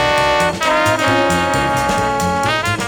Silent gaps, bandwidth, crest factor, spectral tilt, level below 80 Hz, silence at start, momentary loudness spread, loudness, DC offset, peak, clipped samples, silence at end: none; over 20 kHz; 14 dB; -4 dB/octave; -36 dBFS; 0 s; 3 LU; -15 LUFS; under 0.1%; -2 dBFS; under 0.1%; 0 s